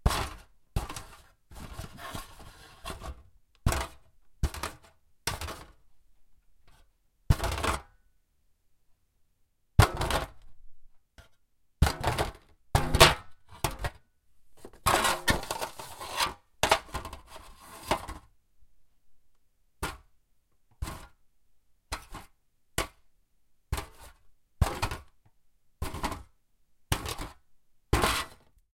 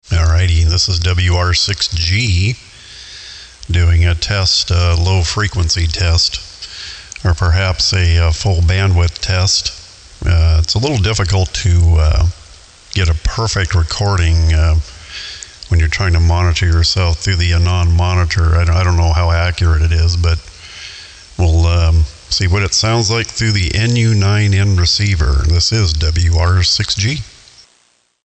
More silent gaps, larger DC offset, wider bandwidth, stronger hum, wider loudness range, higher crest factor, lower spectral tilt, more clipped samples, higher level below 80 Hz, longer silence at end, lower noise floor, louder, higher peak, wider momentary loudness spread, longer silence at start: neither; neither; first, 16.5 kHz vs 8.6 kHz; neither; first, 14 LU vs 2 LU; first, 32 dB vs 10 dB; about the same, -3.5 dB/octave vs -4.5 dB/octave; neither; second, -40 dBFS vs -24 dBFS; second, 0.4 s vs 1 s; first, -69 dBFS vs -56 dBFS; second, -30 LUFS vs -13 LUFS; about the same, -2 dBFS vs -4 dBFS; first, 21 LU vs 14 LU; about the same, 0.05 s vs 0.1 s